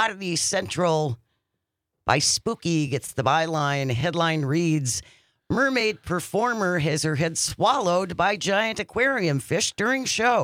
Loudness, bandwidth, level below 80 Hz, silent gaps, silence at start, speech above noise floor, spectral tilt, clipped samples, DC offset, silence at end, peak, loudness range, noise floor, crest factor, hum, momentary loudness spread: -23 LUFS; 16 kHz; -56 dBFS; none; 0 s; 58 dB; -4 dB/octave; under 0.1%; under 0.1%; 0 s; -6 dBFS; 2 LU; -81 dBFS; 18 dB; none; 5 LU